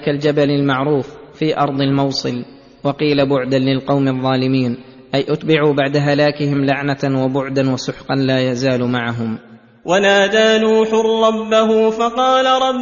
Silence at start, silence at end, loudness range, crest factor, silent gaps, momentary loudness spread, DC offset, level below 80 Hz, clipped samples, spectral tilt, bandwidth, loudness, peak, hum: 0 s; 0 s; 3 LU; 14 dB; none; 9 LU; under 0.1%; -52 dBFS; under 0.1%; -6 dB/octave; 7.4 kHz; -16 LUFS; -2 dBFS; none